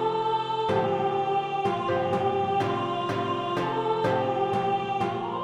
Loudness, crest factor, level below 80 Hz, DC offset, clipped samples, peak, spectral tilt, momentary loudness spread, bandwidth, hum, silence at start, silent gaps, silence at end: -26 LUFS; 14 dB; -62 dBFS; under 0.1%; under 0.1%; -12 dBFS; -6.5 dB/octave; 3 LU; 11.5 kHz; none; 0 s; none; 0 s